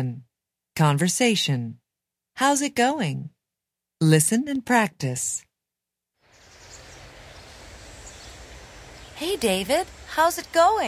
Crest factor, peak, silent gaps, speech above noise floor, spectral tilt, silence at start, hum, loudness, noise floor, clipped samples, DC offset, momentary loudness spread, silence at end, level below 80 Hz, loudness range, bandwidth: 20 dB; -4 dBFS; none; 64 dB; -4 dB/octave; 0 s; none; -22 LUFS; -86 dBFS; under 0.1%; under 0.1%; 24 LU; 0 s; -54 dBFS; 20 LU; 16 kHz